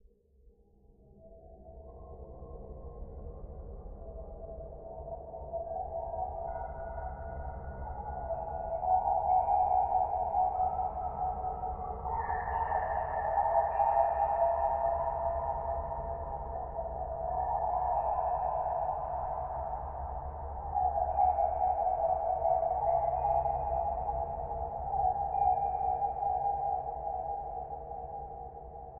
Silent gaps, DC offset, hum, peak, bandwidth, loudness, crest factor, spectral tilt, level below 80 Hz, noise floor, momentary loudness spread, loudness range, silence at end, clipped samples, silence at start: none; under 0.1%; none; -16 dBFS; 2.9 kHz; -33 LUFS; 18 dB; -8.5 dB/octave; -46 dBFS; -63 dBFS; 18 LU; 15 LU; 0 s; under 0.1%; 0.45 s